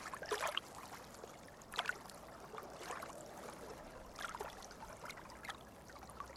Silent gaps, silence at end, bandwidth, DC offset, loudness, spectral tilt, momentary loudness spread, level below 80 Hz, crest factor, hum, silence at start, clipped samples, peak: none; 0 s; over 20 kHz; under 0.1%; -47 LUFS; -2 dB/octave; 13 LU; -66 dBFS; 28 dB; none; 0 s; under 0.1%; -20 dBFS